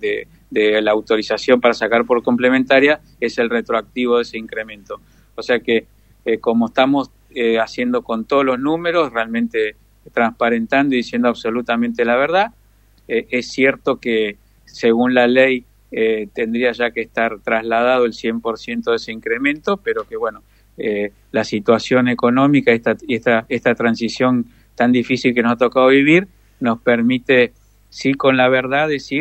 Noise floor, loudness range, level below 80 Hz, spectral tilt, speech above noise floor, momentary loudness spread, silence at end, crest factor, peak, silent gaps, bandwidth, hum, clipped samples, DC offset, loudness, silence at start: -52 dBFS; 4 LU; -52 dBFS; -5.5 dB/octave; 35 dB; 10 LU; 0 s; 18 dB; 0 dBFS; none; 8.4 kHz; none; under 0.1%; under 0.1%; -17 LUFS; 0 s